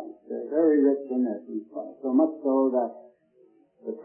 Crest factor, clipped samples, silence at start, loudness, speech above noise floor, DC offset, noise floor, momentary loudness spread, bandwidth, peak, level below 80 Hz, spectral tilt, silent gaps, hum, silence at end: 16 dB; under 0.1%; 0 s; -25 LUFS; 36 dB; under 0.1%; -60 dBFS; 15 LU; 2.2 kHz; -10 dBFS; -86 dBFS; -12.5 dB/octave; none; none; 0 s